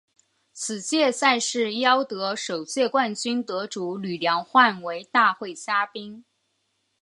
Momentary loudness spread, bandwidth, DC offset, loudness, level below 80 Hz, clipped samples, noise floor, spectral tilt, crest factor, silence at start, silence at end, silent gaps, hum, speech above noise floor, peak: 11 LU; 11.5 kHz; under 0.1%; -23 LUFS; -76 dBFS; under 0.1%; -73 dBFS; -2.5 dB/octave; 20 dB; 0.55 s; 0.8 s; none; none; 49 dB; -4 dBFS